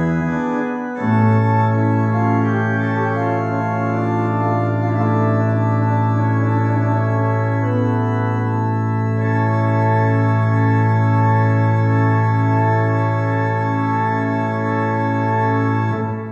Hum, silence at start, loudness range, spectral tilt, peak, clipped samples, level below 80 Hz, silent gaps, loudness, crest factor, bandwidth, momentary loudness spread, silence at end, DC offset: none; 0 s; 2 LU; -9.5 dB/octave; -4 dBFS; under 0.1%; -52 dBFS; none; -18 LUFS; 12 dB; 7 kHz; 4 LU; 0 s; under 0.1%